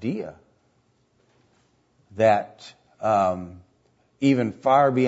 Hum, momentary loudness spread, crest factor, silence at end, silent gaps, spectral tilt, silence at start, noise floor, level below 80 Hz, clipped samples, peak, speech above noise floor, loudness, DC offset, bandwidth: none; 21 LU; 18 dB; 0 s; none; -7 dB/octave; 0 s; -65 dBFS; -66 dBFS; under 0.1%; -6 dBFS; 44 dB; -22 LUFS; under 0.1%; 8 kHz